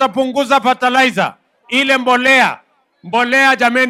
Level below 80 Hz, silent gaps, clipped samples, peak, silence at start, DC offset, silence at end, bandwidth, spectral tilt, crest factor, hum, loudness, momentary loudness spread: -64 dBFS; none; under 0.1%; 0 dBFS; 0 s; under 0.1%; 0 s; 16 kHz; -3 dB/octave; 14 dB; none; -12 LUFS; 9 LU